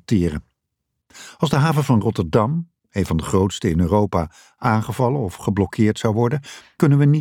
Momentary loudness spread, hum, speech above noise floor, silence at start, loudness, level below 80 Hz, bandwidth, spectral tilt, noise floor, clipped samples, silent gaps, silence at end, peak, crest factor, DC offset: 9 LU; none; 59 dB; 0.1 s; -20 LUFS; -40 dBFS; 15.5 kHz; -7 dB/octave; -77 dBFS; under 0.1%; none; 0 s; -4 dBFS; 16 dB; under 0.1%